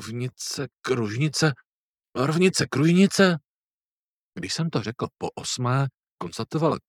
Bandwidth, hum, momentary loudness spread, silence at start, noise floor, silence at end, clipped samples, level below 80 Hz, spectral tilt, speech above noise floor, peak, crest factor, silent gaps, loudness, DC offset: 14.5 kHz; none; 15 LU; 0 s; under -90 dBFS; 0.1 s; under 0.1%; -64 dBFS; -5 dB/octave; over 66 dB; -4 dBFS; 20 dB; 1.66-1.94 s, 3.48-4.31 s, 6.11-6.17 s; -24 LUFS; under 0.1%